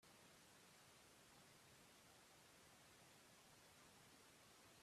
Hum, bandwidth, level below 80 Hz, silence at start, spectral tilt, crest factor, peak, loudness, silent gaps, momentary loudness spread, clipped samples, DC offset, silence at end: none; 14.5 kHz; -90 dBFS; 0 s; -2.5 dB/octave; 14 dB; -56 dBFS; -67 LUFS; none; 0 LU; under 0.1%; under 0.1%; 0 s